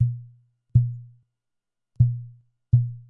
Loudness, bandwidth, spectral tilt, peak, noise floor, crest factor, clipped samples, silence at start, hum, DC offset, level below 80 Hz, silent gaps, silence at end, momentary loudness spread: -24 LUFS; 0.7 kHz; -14 dB/octave; -6 dBFS; -82 dBFS; 20 dB; under 0.1%; 0 s; none; under 0.1%; -44 dBFS; none; 0.1 s; 16 LU